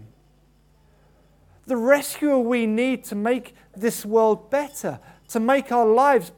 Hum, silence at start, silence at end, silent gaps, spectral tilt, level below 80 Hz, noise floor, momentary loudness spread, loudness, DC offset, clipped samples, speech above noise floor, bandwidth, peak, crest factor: none; 0 s; 0.05 s; none; -4.5 dB/octave; -62 dBFS; -58 dBFS; 12 LU; -22 LUFS; under 0.1%; under 0.1%; 37 dB; 19 kHz; -2 dBFS; 20 dB